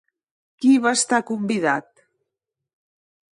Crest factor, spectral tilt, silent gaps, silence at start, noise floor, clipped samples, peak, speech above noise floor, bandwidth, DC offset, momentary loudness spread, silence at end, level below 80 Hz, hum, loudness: 18 dB; -3.5 dB/octave; none; 0.6 s; -83 dBFS; under 0.1%; -4 dBFS; 64 dB; 11.5 kHz; under 0.1%; 7 LU; 1.55 s; -72 dBFS; none; -20 LUFS